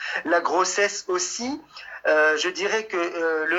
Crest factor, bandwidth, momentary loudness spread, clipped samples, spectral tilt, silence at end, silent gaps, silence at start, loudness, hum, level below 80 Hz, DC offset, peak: 16 dB; 9.6 kHz; 10 LU; under 0.1%; -1 dB/octave; 0 s; none; 0 s; -23 LUFS; none; -70 dBFS; under 0.1%; -8 dBFS